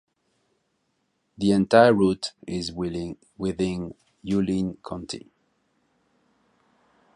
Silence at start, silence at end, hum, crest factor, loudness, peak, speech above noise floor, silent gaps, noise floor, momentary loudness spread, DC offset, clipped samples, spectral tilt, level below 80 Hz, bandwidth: 1.4 s; 1.95 s; none; 24 dB; -24 LUFS; -2 dBFS; 50 dB; none; -73 dBFS; 20 LU; under 0.1%; under 0.1%; -6 dB/octave; -54 dBFS; 11 kHz